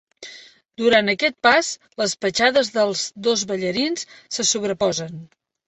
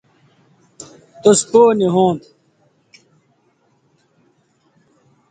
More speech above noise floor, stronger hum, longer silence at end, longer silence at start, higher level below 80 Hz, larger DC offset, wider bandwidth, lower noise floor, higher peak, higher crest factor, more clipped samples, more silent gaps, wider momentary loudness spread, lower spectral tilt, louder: second, 24 dB vs 48 dB; neither; second, 0.4 s vs 3.15 s; second, 0.2 s vs 1.25 s; about the same, -62 dBFS vs -62 dBFS; neither; second, 8.4 kHz vs 9.4 kHz; second, -44 dBFS vs -60 dBFS; about the same, -2 dBFS vs 0 dBFS; about the same, 20 dB vs 20 dB; neither; neither; second, 14 LU vs 27 LU; second, -2.5 dB/octave vs -5 dB/octave; second, -20 LUFS vs -14 LUFS